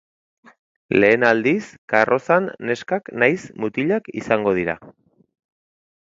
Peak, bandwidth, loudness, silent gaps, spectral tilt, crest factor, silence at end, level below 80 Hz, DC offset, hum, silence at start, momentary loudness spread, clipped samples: 0 dBFS; 7.8 kHz; -19 LUFS; 1.78-1.88 s; -6.5 dB/octave; 20 dB; 1.15 s; -58 dBFS; under 0.1%; none; 0.9 s; 10 LU; under 0.1%